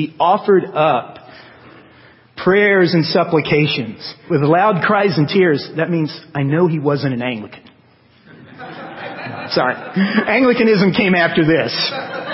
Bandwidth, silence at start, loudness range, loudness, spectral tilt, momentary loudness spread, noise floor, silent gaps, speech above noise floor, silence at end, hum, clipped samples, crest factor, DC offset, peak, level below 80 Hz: 5.8 kHz; 0 s; 7 LU; -15 LUFS; -10 dB/octave; 15 LU; -51 dBFS; none; 35 dB; 0 s; none; under 0.1%; 14 dB; under 0.1%; -2 dBFS; -56 dBFS